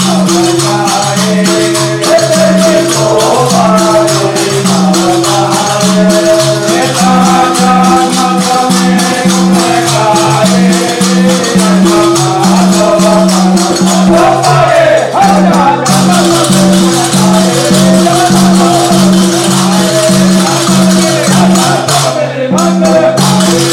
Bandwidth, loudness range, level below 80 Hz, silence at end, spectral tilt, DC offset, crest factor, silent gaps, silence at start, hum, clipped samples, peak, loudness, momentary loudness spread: 16.5 kHz; 1 LU; -40 dBFS; 0 s; -4.5 dB/octave; under 0.1%; 6 dB; none; 0 s; none; under 0.1%; 0 dBFS; -7 LUFS; 3 LU